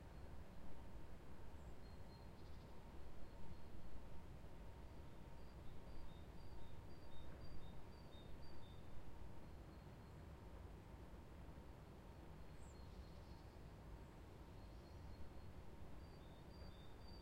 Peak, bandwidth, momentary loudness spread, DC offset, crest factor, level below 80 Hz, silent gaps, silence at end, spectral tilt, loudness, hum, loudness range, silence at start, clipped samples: -38 dBFS; 16 kHz; 1 LU; under 0.1%; 14 dB; -62 dBFS; none; 0 s; -6.5 dB/octave; -61 LUFS; none; 0 LU; 0 s; under 0.1%